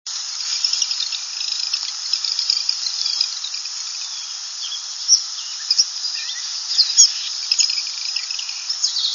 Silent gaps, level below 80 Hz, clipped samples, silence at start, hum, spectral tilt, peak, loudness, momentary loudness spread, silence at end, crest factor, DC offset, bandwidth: none; -84 dBFS; under 0.1%; 0.05 s; none; 8.5 dB/octave; 0 dBFS; -18 LUFS; 10 LU; 0 s; 22 dB; under 0.1%; 11 kHz